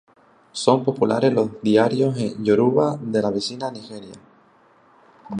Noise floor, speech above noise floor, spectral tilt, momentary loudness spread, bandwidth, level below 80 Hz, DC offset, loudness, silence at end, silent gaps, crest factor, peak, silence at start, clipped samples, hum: -55 dBFS; 35 dB; -6 dB/octave; 14 LU; 11 kHz; -62 dBFS; under 0.1%; -20 LUFS; 0 s; none; 20 dB; -2 dBFS; 0.55 s; under 0.1%; none